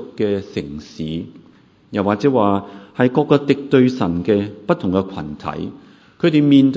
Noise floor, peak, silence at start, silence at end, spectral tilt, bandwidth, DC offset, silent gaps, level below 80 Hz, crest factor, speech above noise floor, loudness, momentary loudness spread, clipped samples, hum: -50 dBFS; 0 dBFS; 0 s; 0 s; -8 dB/octave; 7.8 kHz; under 0.1%; none; -46 dBFS; 18 dB; 32 dB; -18 LUFS; 14 LU; under 0.1%; none